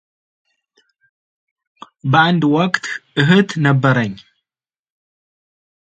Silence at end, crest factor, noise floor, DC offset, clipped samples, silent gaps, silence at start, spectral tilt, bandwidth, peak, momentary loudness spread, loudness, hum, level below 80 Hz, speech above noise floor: 1.8 s; 18 dB; under -90 dBFS; under 0.1%; under 0.1%; none; 2.05 s; -6.5 dB/octave; 8.8 kHz; 0 dBFS; 11 LU; -15 LUFS; none; -60 dBFS; over 75 dB